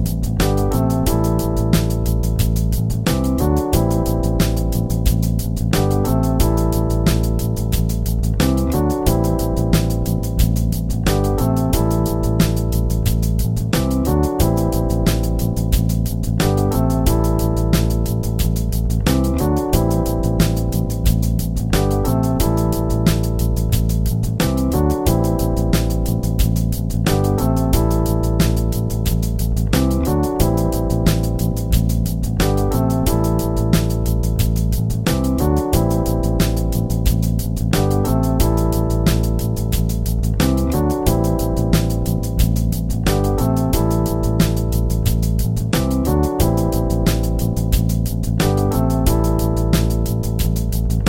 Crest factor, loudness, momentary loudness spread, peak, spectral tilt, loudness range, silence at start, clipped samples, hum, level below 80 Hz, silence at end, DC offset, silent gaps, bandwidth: 16 dB; -18 LUFS; 3 LU; -2 dBFS; -6.5 dB/octave; 0 LU; 0 s; under 0.1%; none; -22 dBFS; 0 s; under 0.1%; none; 17.5 kHz